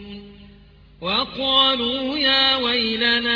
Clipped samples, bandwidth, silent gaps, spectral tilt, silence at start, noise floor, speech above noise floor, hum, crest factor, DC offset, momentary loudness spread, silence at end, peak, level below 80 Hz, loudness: under 0.1%; 5.4 kHz; none; -4.5 dB/octave; 0 s; -48 dBFS; 28 dB; none; 18 dB; under 0.1%; 7 LU; 0 s; -4 dBFS; -50 dBFS; -18 LUFS